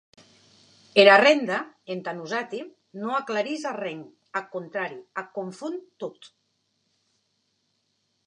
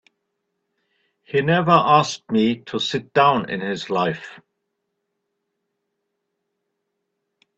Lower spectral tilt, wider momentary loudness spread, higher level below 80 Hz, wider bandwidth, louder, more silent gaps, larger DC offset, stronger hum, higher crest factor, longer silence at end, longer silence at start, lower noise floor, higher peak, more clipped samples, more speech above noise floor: second, -4 dB/octave vs -5.5 dB/octave; first, 21 LU vs 10 LU; second, -82 dBFS vs -62 dBFS; first, 9.8 kHz vs 8.4 kHz; second, -24 LUFS vs -19 LUFS; neither; neither; neither; about the same, 26 dB vs 22 dB; second, 2.15 s vs 3.2 s; second, 0.95 s vs 1.35 s; second, -73 dBFS vs -77 dBFS; about the same, -2 dBFS vs 0 dBFS; neither; second, 49 dB vs 58 dB